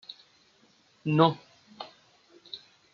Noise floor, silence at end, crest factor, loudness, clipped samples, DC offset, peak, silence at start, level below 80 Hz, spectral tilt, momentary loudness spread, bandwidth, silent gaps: -64 dBFS; 0.35 s; 24 dB; -26 LUFS; under 0.1%; under 0.1%; -8 dBFS; 1.05 s; -76 dBFS; -5.5 dB/octave; 23 LU; 7 kHz; none